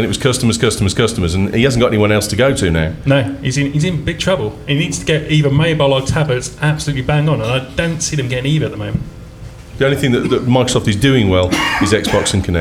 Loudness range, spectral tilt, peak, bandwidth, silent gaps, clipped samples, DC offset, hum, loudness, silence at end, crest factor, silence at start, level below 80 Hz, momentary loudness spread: 3 LU; -5 dB/octave; 0 dBFS; 15.5 kHz; none; under 0.1%; under 0.1%; none; -15 LUFS; 0 s; 14 dB; 0 s; -32 dBFS; 5 LU